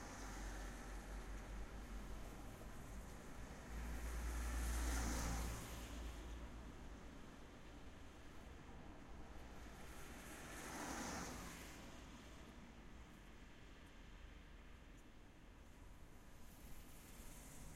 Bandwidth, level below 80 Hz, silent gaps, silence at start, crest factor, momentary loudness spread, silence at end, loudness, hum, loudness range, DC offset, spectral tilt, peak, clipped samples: 16 kHz; -54 dBFS; none; 0 s; 20 dB; 16 LU; 0 s; -53 LUFS; none; 14 LU; under 0.1%; -4 dB/octave; -30 dBFS; under 0.1%